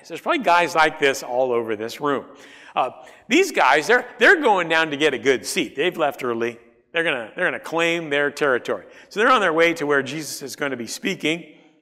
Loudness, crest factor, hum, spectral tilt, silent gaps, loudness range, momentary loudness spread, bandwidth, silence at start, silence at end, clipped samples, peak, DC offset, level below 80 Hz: -20 LUFS; 18 dB; none; -3 dB/octave; none; 4 LU; 11 LU; 15.5 kHz; 0.05 s; 0.35 s; under 0.1%; -4 dBFS; under 0.1%; -66 dBFS